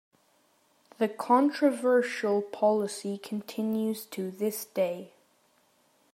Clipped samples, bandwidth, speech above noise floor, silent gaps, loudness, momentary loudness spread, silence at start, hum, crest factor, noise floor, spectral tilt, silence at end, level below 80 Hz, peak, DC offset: under 0.1%; 16 kHz; 39 dB; none; -29 LUFS; 11 LU; 1 s; none; 18 dB; -67 dBFS; -5 dB/octave; 1.05 s; -86 dBFS; -12 dBFS; under 0.1%